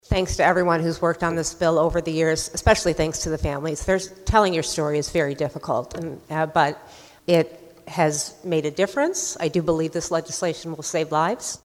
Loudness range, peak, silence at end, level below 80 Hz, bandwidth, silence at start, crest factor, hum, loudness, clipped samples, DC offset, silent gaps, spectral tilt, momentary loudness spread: 3 LU; -2 dBFS; 0.1 s; -40 dBFS; 16.5 kHz; 0.1 s; 20 dB; none; -23 LUFS; under 0.1%; under 0.1%; none; -4.5 dB/octave; 8 LU